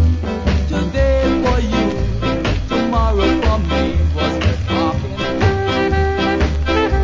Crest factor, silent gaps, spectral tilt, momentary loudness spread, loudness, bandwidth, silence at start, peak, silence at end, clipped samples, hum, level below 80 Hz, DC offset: 14 dB; none; -7 dB/octave; 4 LU; -17 LUFS; 7.6 kHz; 0 s; -2 dBFS; 0 s; under 0.1%; none; -20 dBFS; under 0.1%